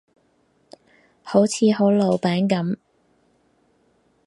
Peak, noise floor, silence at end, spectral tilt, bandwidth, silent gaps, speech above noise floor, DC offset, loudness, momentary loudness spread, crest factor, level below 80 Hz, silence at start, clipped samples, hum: -2 dBFS; -63 dBFS; 1.5 s; -6 dB/octave; 11.5 kHz; none; 45 dB; under 0.1%; -20 LUFS; 8 LU; 20 dB; -68 dBFS; 1.25 s; under 0.1%; none